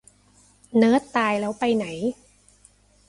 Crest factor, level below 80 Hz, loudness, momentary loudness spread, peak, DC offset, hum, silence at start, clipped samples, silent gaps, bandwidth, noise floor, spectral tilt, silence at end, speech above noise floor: 20 dB; -62 dBFS; -23 LUFS; 11 LU; -6 dBFS; under 0.1%; 50 Hz at -55 dBFS; 0.75 s; under 0.1%; none; 11.5 kHz; -57 dBFS; -5.5 dB/octave; 0.95 s; 36 dB